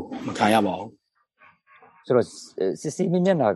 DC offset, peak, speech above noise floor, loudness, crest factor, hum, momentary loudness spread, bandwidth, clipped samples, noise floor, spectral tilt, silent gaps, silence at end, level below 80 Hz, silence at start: under 0.1%; -6 dBFS; 35 dB; -24 LUFS; 20 dB; none; 12 LU; 12.5 kHz; under 0.1%; -58 dBFS; -6 dB/octave; none; 0 s; -68 dBFS; 0 s